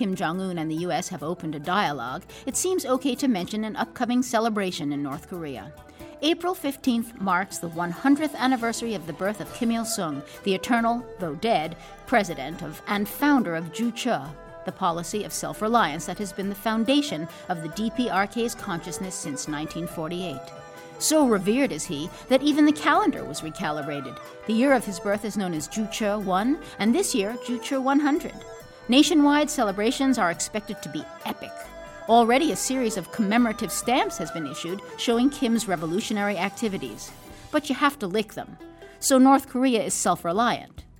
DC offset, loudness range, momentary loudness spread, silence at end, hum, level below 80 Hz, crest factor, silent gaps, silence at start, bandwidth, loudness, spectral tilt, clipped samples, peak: under 0.1%; 4 LU; 13 LU; 0.2 s; none; -54 dBFS; 20 dB; none; 0 s; 17.5 kHz; -25 LUFS; -4 dB/octave; under 0.1%; -4 dBFS